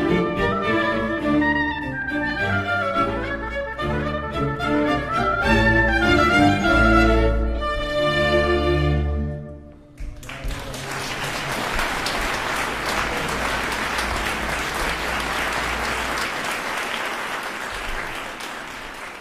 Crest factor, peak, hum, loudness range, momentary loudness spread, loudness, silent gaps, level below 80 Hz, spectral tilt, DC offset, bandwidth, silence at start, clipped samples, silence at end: 18 dB; -4 dBFS; none; 8 LU; 13 LU; -22 LUFS; none; -30 dBFS; -5 dB/octave; under 0.1%; 15.5 kHz; 0 s; under 0.1%; 0 s